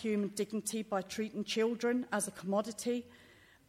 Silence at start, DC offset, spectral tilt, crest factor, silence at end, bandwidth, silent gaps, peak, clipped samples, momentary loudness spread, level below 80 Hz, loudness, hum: 0 s; under 0.1%; -4 dB/octave; 16 dB; 0.45 s; 16 kHz; none; -20 dBFS; under 0.1%; 6 LU; -74 dBFS; -36 LUFS; none